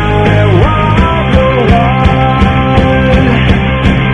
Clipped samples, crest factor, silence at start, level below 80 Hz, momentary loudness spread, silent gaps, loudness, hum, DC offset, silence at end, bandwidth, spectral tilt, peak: 1%; 8 dB; 0 s; -16 dBFS; 2 LU; none; -8 LUFS; none; under 0.1%; 0 s; 8.4 kHz; -8 dB/octave; 0 dBFS